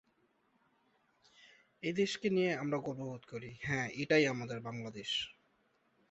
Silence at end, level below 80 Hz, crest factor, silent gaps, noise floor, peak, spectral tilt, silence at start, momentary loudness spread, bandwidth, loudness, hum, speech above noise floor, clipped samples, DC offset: 0.8 s; -72 dBFS; 22 dB; none; -75 dBFS; -16 dBFS; -3.5 dB/octave; 1.4 s; 14 LU; 8 kHz; -36 LUFS; none; 39 dB; under 0.1%; under 0.1%